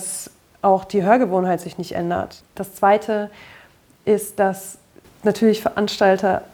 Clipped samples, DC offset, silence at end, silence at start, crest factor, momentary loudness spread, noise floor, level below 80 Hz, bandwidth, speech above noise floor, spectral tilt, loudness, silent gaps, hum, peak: under 0.1%; under 0.1%; 0.1 s; 0 s; 18 dB; 16 LU; -51 dBFS; -56 dBFS; 19.5 kHz; 32 dB; -5 dB/octave; -20 LUFS; none; none; -2 dBFS